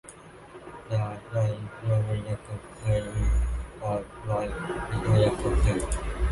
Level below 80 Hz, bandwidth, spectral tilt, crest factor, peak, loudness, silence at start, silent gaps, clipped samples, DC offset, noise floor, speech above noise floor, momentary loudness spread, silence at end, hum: -32 dBFS; 11.5 kHz; -6.5 dB/octave; 16 dB; -10 dBFS; -29 LUFS; 0.05 s; none; under 0.1%; under 0.1%; -47 dBFS; 19 dB; 16 LU; 0 s; none